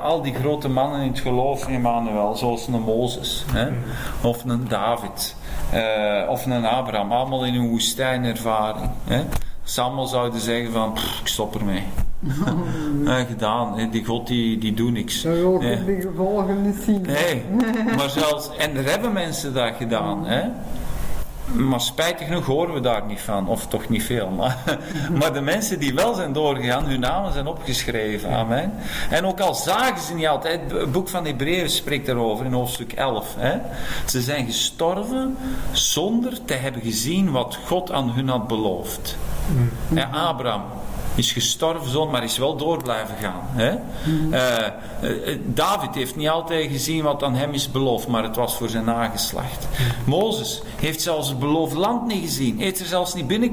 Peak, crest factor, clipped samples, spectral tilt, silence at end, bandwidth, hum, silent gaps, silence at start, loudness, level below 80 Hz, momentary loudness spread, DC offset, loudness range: -6 dBFS; 16 dB; under 0.1%; -4.5 dB/octave; 0 s; 16 kHz; none; none; 0 s; -23 LUFS; -38 dBFS; 6 LU; under 0.1%; 2 LU